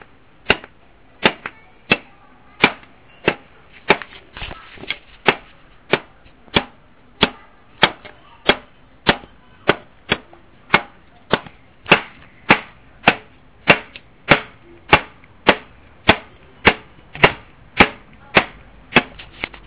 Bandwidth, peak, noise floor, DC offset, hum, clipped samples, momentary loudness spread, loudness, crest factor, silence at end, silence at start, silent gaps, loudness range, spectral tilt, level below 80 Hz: 4 kHz; 0 dBFS; -50 dBFS; 0.3%; none; 0.1%; 18 LU; -18 LUFS; 22 dB; 0.2 s; 0.5 s; none; 5 LU; -8 dB/octave; -42 dBFS